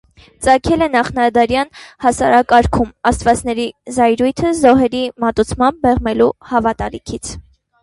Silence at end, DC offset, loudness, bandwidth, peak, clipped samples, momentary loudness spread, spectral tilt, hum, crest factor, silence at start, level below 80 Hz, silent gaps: 0.4 s; under 0.1%; -15 LUFS; 11.5 kHz; 0 dBFS; under 0.1%; 12 LU; -5 dB/octave; none; 14 dB; 0.4 s; -34 dBFS; none